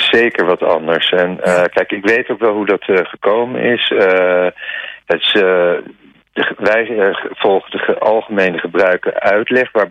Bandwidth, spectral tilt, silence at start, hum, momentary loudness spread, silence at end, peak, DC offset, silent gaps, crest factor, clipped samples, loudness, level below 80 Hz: 10.5 kHz; -5 dB/octave; 0 s; none; 6 LU; 0 s; -2 dBFS; under 0.1%; none; 12 dB; under 0.1%; -14 LUFS; -58 dBFS